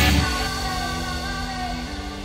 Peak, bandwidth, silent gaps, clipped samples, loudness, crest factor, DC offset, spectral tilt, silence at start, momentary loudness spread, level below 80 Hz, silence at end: -6 dBFS; 16 kHz; none; under 0.1%; -25 LUFS; 18 dB; under 0.1%; -4 dB/octave; 0 s; 8 LU; -30 dBFS; 0 s